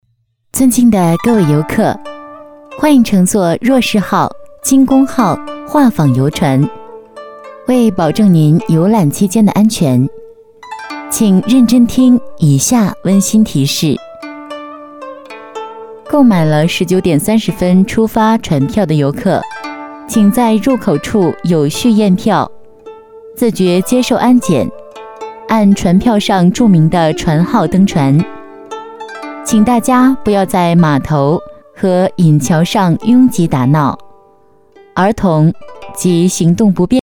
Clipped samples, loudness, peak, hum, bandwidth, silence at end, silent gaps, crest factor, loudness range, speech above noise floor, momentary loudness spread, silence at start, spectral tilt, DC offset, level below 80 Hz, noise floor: under 0.1%; -11 LUFS; 0 dBFS; none; over 20 kHz; 0.05 s; none; 12 dB; 3 LU; 50 dB; 18 LU; 0.55 s; -6 dB/octave; under 0.1%; -40 dBFS; -60 dBFS